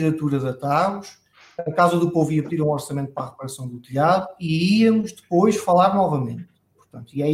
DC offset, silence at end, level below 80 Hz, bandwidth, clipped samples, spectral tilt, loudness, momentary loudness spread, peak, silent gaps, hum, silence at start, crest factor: under 0.1%; 0 s; -60 dBFS; 16 kHz; under 0.1%; -6.5 dB/octave; -21 LUFS; 15 LU; -4 dBFS; none; none; 0 s; 18 dB